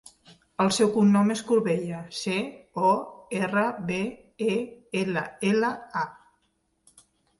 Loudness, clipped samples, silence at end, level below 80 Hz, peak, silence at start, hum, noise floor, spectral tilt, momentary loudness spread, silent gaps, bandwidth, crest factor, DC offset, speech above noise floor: -26 LUFS; under 0.1%; 1.25 s; -66 dBFS; -10 dBFS; 0.6 s; none; -72 dBFS; -5.5 dB/octave; 12 LU; none; 11.5 kHz; 16 dB; under 0.1%; 47 dB